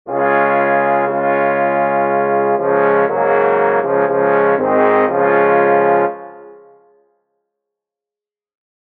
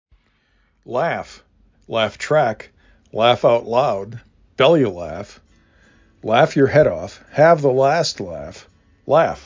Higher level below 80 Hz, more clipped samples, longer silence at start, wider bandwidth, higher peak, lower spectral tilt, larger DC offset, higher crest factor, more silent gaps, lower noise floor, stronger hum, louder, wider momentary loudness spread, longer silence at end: second, -64 dBFS vs -50 dBFS; neither; second, 0.05 s vs 0.9 s; second, 4.2 kHz vs 7.6 kHz; about the same, 0 dBFS vs -2 dBFS; about the same, -5 dB/octave vs -5.5 dB/octave; neither; about the same, 14 dB vs 18 dB; neither; first, -89 dBFS vs -61 dBFS; neither; first, -14 LUFS vs -17 LUFS; second, 3 LU vs 19 LU; first, 2.4 s vs 0.05 s